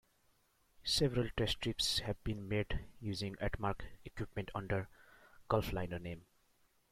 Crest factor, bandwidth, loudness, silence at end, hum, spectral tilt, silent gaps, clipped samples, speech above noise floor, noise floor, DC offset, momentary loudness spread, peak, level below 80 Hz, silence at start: 22 dB; 16 kHz; -38 LUFS; 0.7 s; none; -4.5 dB/octave; none; under 0.1%; 36 dB; -74 dBFS; under 0.1%; 13 LU; -18 dBFS; -52 dBFS; 0.8 s